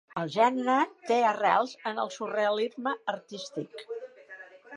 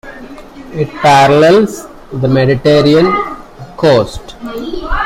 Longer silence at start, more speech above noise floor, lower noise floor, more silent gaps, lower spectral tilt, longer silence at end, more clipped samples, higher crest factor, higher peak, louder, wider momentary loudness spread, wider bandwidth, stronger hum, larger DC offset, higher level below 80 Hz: about the same, 0.15 s vs 0.05 s; about the same, 21 dB vs 21 dB; first, -49 dBFS vs -30 dBFS; neither; second, -4.5 dB/octave vs -6 dB/octave; about the same, 0 s vs 0 s; neither; first, 20 dB vs 12 dB; second, -10 dBFS vs 0 dBFS; second, -28 LUFS vs -10 LUFS; second, 17 LU vs 21 LU; second, 11 kHz vs 16 kHz; neither; neither; second, -82 dBFS vs -30 dBFS